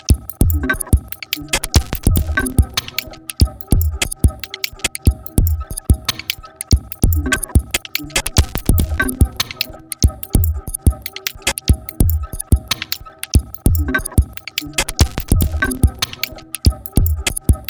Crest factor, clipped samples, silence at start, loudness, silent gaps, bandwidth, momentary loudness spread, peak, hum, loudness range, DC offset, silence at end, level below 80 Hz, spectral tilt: 18 dB; under 0.1%; 0.1 s; -18 LUFS; none; over 20 kHz; 7 LU; 0 dBFS; none; 1 LU; under 0.1%; 0.05 s; -20 dBFS; -4 dB/octave